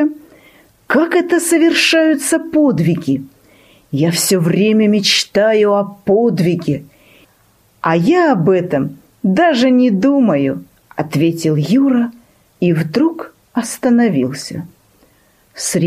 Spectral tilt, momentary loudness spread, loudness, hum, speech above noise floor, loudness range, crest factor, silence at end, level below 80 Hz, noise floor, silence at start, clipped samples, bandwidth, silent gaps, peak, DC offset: -5 dB/octave; 11 LU; -14 LUFS; none; 40 dB; 3 LU; 14 dB; 0 s; -56 dBFS; -53 dBFS; 0 s; under 0.1%; 15.5 kHz; none; 0 dBFS; under 0.1%